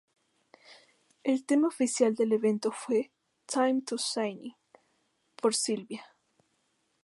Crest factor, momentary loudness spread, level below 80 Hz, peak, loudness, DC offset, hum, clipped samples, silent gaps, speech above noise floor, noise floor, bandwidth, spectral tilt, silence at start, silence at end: 20 dB; 15 LU; -86 dBFS; -12 dBFS; -29 LUFS; under 0.1%; none; under 0.1%; none; 46 dB; -75 dBFS; 11.5 kHz; -3.5 dB/octave; 0.7 s; 1 s